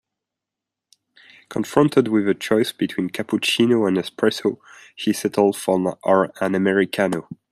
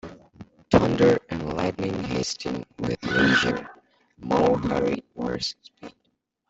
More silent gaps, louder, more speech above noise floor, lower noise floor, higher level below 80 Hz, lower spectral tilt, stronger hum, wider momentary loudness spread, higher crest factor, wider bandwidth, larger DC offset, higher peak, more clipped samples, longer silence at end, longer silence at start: neither; first, -20 LUFS vs -24 LUFS; first, 66 dB vs 50 dB; first, -85 dBFS vs -74 dBFS; second, -64 dBFS vs -48 dBFS; about the same, -5 dB/octave vs -5.5 dB/octave; neither; second, 9 LU vs 13 LU; about the same, 18 dB vs 22 dB; first, 15 kHz vs 8.2 kHz; neither; about the same, -2 dBFS vs -2 dBFS; neither; second, 0.2 s vs 0.6 s; first, 1.5 s vs 0.05 s